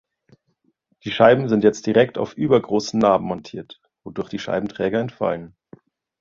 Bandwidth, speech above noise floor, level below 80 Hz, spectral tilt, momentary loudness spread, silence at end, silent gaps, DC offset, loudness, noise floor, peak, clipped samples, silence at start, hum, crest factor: 7.6 kHz; 49 dB; -56 dBFS; -6 dB/octave; 18 LU; 0.7 s; none; under 0.1%; -20 LUFS; -68 dBFS; -2 dBFS; under 0.1%; 1.05 s; none; 20 dB